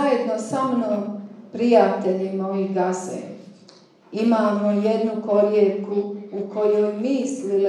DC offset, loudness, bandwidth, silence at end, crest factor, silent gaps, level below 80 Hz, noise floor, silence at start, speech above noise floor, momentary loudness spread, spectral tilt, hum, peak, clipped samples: under 0.1%; -21 LUFS; 11 kHz; 0 s; 20 dB; none; -86 dBFS; -50 dBFS; 0 s; 30 dB; 14 LU; -6.5 dB/octave; none; -2 dBFS; under 0.1%